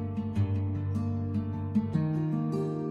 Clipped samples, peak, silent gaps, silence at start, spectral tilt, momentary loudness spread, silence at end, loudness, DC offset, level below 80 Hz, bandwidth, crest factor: under 0.1%; -16 dBFS; none; 0 s; -10 dB/octave; 3 LU; 0 s; -31 LUFS; under 0.1%; -58 dBFS; 6.4 kHz; 14 dB